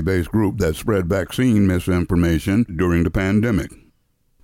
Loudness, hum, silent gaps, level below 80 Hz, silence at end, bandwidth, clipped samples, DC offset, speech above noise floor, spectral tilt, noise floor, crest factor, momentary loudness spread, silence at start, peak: -19 LUFS; none; none; -36 dBFS; 0.7 s; 16.5 kHz; under 0.1%; under 0.1%; 45 dB; -7 dB/octave; -63 dBFS; 12 dB; 4 LU; 0 s; -6 dBFS